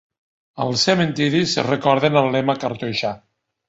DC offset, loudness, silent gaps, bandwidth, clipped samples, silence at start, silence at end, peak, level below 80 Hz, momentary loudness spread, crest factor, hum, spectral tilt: under 0.1%; -19 LUFS; none; 8 kHz; under 0.1%; 0.55 s; 0.5 s; -2 dBFS; -58 dBFS; 8 LU; 18 dB; none; -5 dB/octave